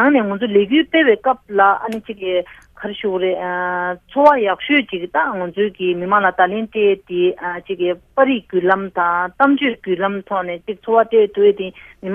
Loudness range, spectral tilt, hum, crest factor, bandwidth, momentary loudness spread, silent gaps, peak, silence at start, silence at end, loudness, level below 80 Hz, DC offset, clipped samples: 2 LU; -7 dB/octave; none; 16 dB; 5 kHz; 11 LU; none; 0 dBFS; 0 s; 0 s; -17 LUFS; -56 dBFS; under 0.1%; under 0.1%